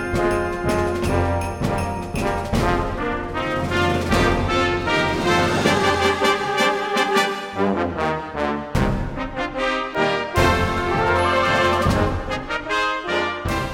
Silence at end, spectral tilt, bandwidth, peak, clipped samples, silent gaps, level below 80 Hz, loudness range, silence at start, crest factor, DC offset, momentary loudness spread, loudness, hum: 0 s; -5 dB/octave; 17 kHz; -4 dBFS; under 0.1%; none; -34 dBFS; 4 LU; 0 s; 16 dB; under 0.1%; 7 LU; -20 LUFS; none